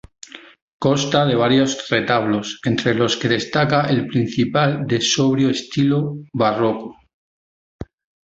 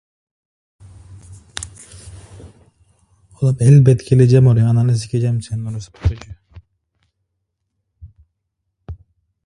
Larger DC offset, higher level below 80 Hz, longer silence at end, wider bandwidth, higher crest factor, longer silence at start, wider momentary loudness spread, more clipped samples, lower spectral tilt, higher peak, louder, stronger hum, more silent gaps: neither; second, -52 dBFS vs -38 dBFS; about the same, 0.45 s vs 0.5 s; second, 8 kHz vs 11 kHz; about the same, 18 dB vs 18 dB; second, 0.35 s vs 1.1 s; second, 21 LU vs 27 LU; neither; second, -5 dB/octave vs -8 dB/octave; about the same, -2 dBFS vs 0 dBFS; second, -18 LUFS vs -15 LUFS; neither; first, 0.62-0.80 s, 7.14-7.79 s vs none